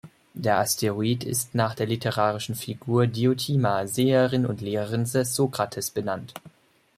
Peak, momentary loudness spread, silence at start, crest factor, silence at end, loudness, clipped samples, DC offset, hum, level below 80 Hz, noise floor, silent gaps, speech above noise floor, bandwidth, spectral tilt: -8 dBFS; 9 LU; 0.05 s; 18 dB; 0.5 s; -25 LUFS; under 0.1%; under 0.1%; none; -62 dBFS; -56 dBFS; none; 32 dB; 16 kHz; -5 dB/octave